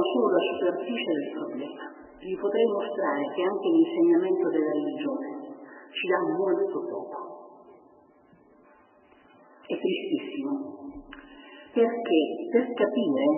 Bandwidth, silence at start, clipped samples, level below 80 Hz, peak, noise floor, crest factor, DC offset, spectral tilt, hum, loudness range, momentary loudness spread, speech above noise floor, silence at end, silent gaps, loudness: 3.2 kHz; 0 s; under 0.1%; -70 dBFS; -10 dBFS; -58 dBFS; 18 dB; under 0.1%; -9.5 dB/octave; none; 10 LU; 19 LU; 32 dB; 0 s; none; -27 LUFS